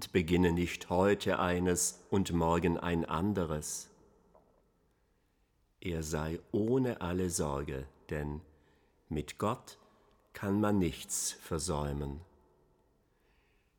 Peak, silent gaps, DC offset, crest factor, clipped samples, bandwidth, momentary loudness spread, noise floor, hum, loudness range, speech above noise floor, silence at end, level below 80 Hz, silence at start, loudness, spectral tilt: -14 dBFS; none; under 0.1%; 20 dB; under 0.1%; 19.5 kHz; 12 LU; -73 dBFS; none; 8 LU; 41 dB; 1.55 s; -52 dBFS; 0 s; -33 LUFS; -5 dB/octave